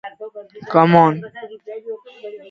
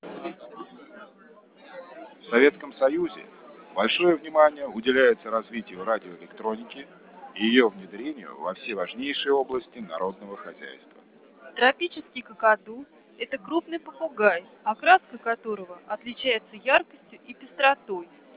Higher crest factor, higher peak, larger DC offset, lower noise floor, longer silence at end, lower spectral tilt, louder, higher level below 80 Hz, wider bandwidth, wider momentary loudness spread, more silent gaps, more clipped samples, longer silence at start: about the same, 18 dB vs 22 dB; first, 0 dBFS vs -4 dBFS; neither; second, -36 dBFS vs -54 dBFS; second, 0.15 s vs 0.35 s; first, -9 dB/octave vs -7.5 dB/octave; first, -15 LUFS vs -25 LUFS; first, -64 dBFS vs -72 dBFS; first, 6.2 kHz vs 4 kHz; about the same, 23 LU vs 22 LU; neither; neither; about the same, 0.05 s vs 0.05 s